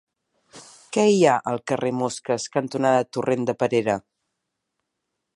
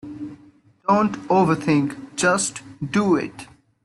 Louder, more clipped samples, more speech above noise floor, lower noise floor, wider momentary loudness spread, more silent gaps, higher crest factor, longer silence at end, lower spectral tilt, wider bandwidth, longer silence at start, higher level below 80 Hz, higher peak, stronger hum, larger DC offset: about the same, -22 LUFS vs -21 LUFS; neither; first, 58 dB vs 32 dB; first, -80 dBFS vs -52 dBFS; second, 9 LU vs 16 LU; neither; about the same, 20 dB vs 16 dB; first, 1.35 s vs 0.4 s; about the same, -5 dB/octave vs -5 dB/octave; about the same, 11.5 kHz vs 12 kHz; first, 0.55 s vs 0.05 s; second, -68 dBFS vs -60 dBFS; about the same, -4 dBFS vs -6 dBFS; neither; neither